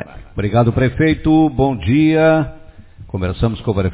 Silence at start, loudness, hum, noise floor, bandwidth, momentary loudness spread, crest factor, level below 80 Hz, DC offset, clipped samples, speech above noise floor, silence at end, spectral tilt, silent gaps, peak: 0 s; -15 LUFS; none; -38 dBFS; 4 kHz; 11 LU; 16 dB; -32 dBFS; under 0.1%; under 0.1%; 23 dB; 0 s; -12 dB/octave; none; 0 dBFS